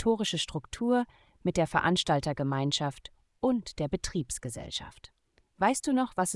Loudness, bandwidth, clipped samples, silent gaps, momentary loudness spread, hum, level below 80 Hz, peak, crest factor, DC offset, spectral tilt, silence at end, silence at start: -30 LUFS; 12 kHz; under 0.1%; none; 10 LU; none; -52 dBFS; -10 dBFS; 22 dB; under 0.1%; -4.5 dB/octave; 0 s; 0 s